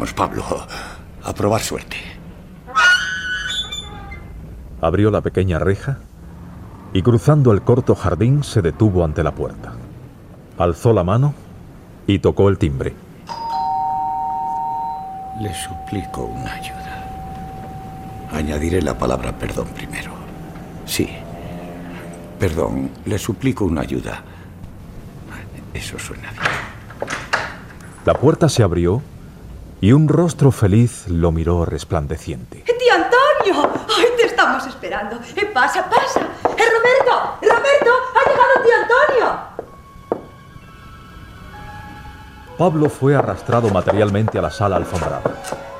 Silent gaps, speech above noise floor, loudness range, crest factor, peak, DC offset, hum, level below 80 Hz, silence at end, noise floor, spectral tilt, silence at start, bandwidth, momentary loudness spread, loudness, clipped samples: none; 23 dB; 11 LU; 16 dB; -2 dBFS; under 0.1%; none; -36 dBFS; 0 s; -40 dBFS; -6 dB/octave; 0 s; 16 kHz; 21 LU; -18 LUFS; under 0.1%